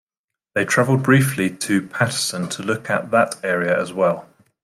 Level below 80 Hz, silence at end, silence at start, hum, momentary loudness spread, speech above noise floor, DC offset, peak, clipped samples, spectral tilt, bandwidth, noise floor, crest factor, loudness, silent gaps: -62 dBFS; 0.4 s; 0.55 s; none; 8 LU; 67 dB; under 0.1%; -2 dBFS; under 0.1%; -5 dB/octave; 16 kHz; -86 dBFS; 18 dB; -20 LUFS; none